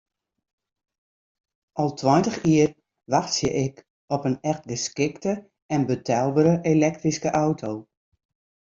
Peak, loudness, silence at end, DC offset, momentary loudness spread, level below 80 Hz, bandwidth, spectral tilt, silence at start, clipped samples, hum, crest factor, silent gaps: -6 dBFS; -24 LUFS; 0.95 s; under 0.1%; 10 LU; -58 dBFS; 7.8 kHz; -5.5 dB/octave; 1.75 s; under 0.1%; none; 20 dB; 3.90-4.08 s, 5.62-5.69 s